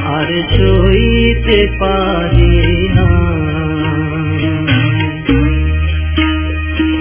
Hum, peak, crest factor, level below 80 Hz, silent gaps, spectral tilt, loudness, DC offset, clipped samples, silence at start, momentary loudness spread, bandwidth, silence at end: none; 0 dBFS; 12 dB; -16 dBFS; none; -11 dB/octave; -13 LUFS; under 0.1%; under 0.1%; 0 s; 6 LU; 4 kHz; 0 s